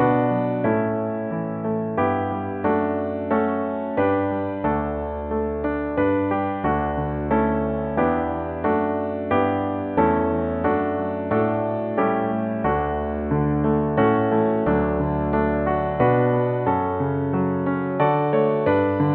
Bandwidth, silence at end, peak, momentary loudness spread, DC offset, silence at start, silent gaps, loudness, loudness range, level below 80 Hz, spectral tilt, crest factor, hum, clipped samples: 4.2 kHz; 0 s; -6 dBFS; 6 LU; under 0.1%; 0 s; none; -22 LUFS; 3 LU; -40 dBFS; -7.5 dB/octave; 16 dB; none; under 0.1%